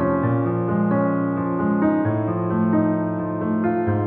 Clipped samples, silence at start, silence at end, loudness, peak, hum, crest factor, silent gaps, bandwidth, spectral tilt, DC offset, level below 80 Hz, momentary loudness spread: under 0.1%; 0 s; 0 s; -21 LUFS; -8 dBFS; none; 12 dB; none; 3.6 kHz; -10 dB/octave; under 0.1%; -52 dBFS; 4 LU